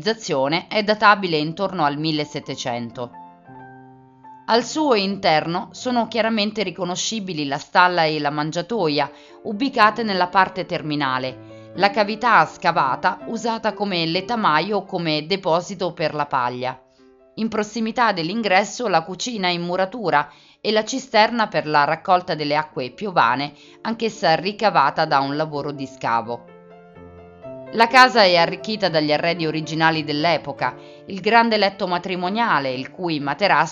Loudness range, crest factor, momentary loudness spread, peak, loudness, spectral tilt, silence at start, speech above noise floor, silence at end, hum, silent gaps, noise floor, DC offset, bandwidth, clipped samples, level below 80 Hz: 5 LU; 20 dB; 12 LU; 0 dBFS; -20 LUFS; -4.5 dB/octave; 0 s; 32 dB; 0 s; none; none; -52 dBFS; under 0.1%; 10.5 kHz; under 0.1%; -62 dBFS